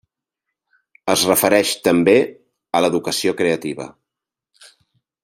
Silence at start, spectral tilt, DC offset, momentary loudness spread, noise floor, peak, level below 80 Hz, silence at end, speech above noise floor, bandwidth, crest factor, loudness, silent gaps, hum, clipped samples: 1.05 s; -3.5 dB/octave; under 0.1%; 14 LU; -85 dBFS; 0 dBFS; -62 dBFS; 1.35 s; 68 dB; 16 kHz; 18 dB; -17 LUFS; none; none; under 0.1%